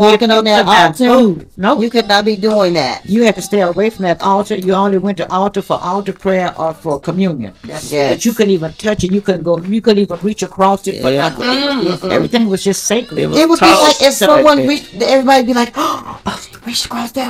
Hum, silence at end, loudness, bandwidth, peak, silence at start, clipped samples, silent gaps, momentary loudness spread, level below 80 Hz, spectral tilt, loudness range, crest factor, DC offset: none; 0 s; -12 LUFS; 16.5 kHz; 0 dBFS; 0 s; 0.3%; none; 10 LU; -44 dBFS; -4.5 dB/octave; 6 LU; 12 dB; under 0.1%